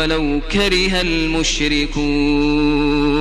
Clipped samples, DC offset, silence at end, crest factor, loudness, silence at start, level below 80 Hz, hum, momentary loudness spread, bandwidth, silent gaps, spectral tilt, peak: under 0.1%; under 0.1%; 0 s; 14 dB; -16 LUFS; 0 s; -26 dBFS; none; 3 LU; 12 kHz; none; -4 dB/octave; -2 dBFS